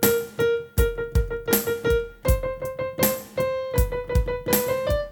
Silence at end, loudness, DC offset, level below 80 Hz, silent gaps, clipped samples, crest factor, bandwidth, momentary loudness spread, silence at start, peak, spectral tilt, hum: 0 s; -24 LUFS; under 0.1%; -30 dBFS; none; under 0.1%; 18 dB; 19 kHz; 4 LU; 0 s; -6 dBFS; -5 dB/octave; none